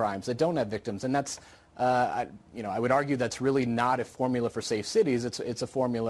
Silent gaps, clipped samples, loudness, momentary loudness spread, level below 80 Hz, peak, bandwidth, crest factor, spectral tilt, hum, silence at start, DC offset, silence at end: none; under 0.1%; -29 LUFS; 8 LU; -62 dBFS; -12 dBFS; 12 kHz; 18 dB; -5.5 dB/octave; none; 0 s; under 0.1%; 0 s